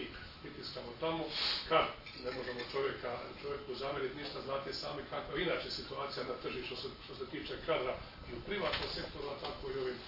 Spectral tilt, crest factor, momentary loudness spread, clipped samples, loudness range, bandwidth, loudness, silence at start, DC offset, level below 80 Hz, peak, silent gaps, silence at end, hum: -5 dB/octave; 24 dB; 10 LU; under 0.1%; 3 LU; 5.8 kHz; -39 LUFS; 0 s; under 0.1%; -58 dBFS; -16 dBFS; none; 0 s; none